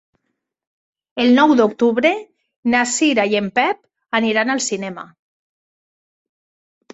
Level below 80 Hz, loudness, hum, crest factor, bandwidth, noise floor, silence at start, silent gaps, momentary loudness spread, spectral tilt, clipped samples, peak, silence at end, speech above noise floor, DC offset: -62 dBFS; -17 LUFS; none; 18 dB; 8.2 kHz; -75 dBFS; 1.15 s; 2.56-2.63 s; 14 LU; -3.5 dB/octave; under 0.1%; -2 dBFS; 1.9 s; 59 dB; under 0.1%